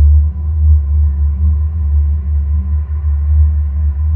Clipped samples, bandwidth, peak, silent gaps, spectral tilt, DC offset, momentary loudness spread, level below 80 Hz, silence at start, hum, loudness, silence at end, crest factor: under 0.1%; 1.2 kHz; -2 dBFS; none; -13 dB/octave; under 0.1%; 4 LU; -12 dBFS; 0 s; none; -14 LUFS; 0 s; 10 dB